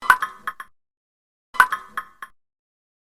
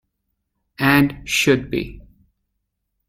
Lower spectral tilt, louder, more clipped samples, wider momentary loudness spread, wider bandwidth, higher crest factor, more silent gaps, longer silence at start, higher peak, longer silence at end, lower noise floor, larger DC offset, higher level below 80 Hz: second, 0 dB/octave vs -4.5 dB/octave; about the same, -20 LUFS vs -18 LUFS; neither; first, 24 LU vs 11 LU; about the same, 17 kHz vs 16 kHz; first, 26 dB vs 20 dB; first, 0.97-1.53 s vs none; second, 0 s vs 0.8 s; about the same, 0 dBFS vs -2 dBFS; about the same, 0.95 s vs 1.05 s; first, under -90 dBFS vs -75 dBFS; neither; second, -62 dBFS vs -44 dBFS